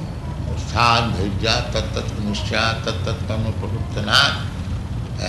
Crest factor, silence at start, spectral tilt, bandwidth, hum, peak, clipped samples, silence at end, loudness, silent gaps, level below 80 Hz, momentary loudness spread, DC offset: 20 dB; 0 s; -4.5 dB/octave; 12 kHz; none; -2 dBFS; under 0.1%; 0 s; -20 LUFS; none; -32 dBFS; 12 LU; under 0.1%